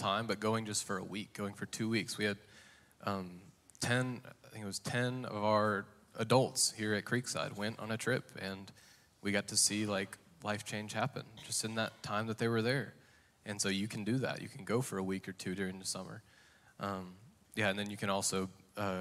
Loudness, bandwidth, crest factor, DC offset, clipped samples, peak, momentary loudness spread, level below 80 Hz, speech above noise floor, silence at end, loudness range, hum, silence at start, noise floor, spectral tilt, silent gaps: -36 LUFS; 16 kHz; 22 dB; under 0.1%; under 0.1%; -16 dBFS; 13 LU; -76 dBFS; 28 dB; 0 s; 5 LU; none; 0 s; -64 dBFS; -3.5 dB/octave; none